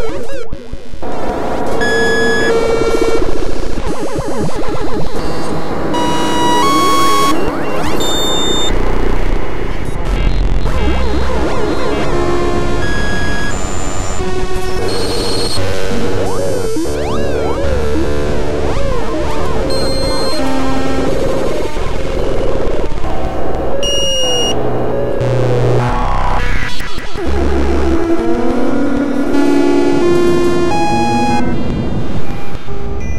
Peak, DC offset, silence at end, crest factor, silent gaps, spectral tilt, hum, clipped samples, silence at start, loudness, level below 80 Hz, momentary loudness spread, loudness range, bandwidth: 0 dBFS; 20%; 0 s; 14 dB; none; -5 dB/octave; none; under 0.1%; 0 s; -16 LUFS; -22 dBFS; 9 LU; 4 LU; 15.5 kHz